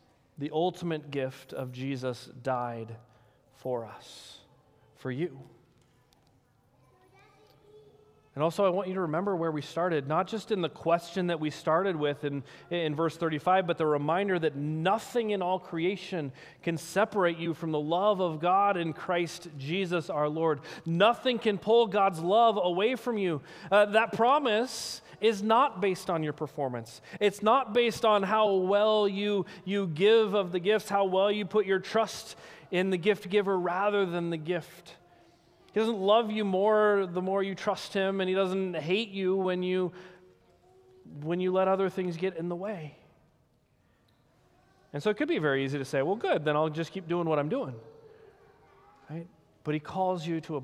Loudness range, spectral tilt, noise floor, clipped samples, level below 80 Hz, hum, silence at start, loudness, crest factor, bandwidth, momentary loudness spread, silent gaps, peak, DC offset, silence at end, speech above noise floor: 11 LU; -5.5 dB/octave; -68 dBFS; under 0.1%; -72 dBFS; none; 0.4 s; -29 LUFS; 20 dB; 15.5 kHz; 12 LU; none; -10 dBFS; under 0.1%; 0 s; 39 dB